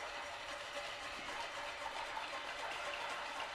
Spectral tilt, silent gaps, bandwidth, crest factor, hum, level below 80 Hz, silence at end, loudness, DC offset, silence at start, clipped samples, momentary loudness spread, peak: -1 dB/octave; none; 15.5 kHz; 14 dB; none; -68 dBFS; 0 s; -43 LUFS; under 0.1%; 0 s; under 0.1%; 3 LU; -30 dBFS